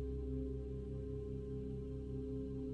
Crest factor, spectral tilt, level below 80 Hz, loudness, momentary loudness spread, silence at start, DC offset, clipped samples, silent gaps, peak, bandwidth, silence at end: 12 dB; -10.5 dB/octave; -48 dBFS; -45 LUFS; 2 LU; 0 s; under 0.1%; under 0.1%; none; -32 dBFS; 4.4 kHz; 0 s